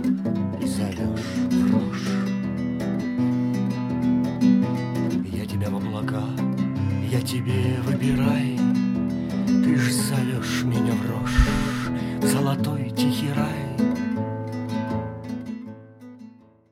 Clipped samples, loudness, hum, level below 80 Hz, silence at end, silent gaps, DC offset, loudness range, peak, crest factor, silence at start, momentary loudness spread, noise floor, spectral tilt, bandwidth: under 0.1%; -24 LUFS; none; -38 dBFS; 0.4 s; none; under 0.1%; 3 LU; -4 dBFS; 20 dB; 0 s; 7 LU; -47 dBFS; -6.5 dB/octave; 15.5 kHz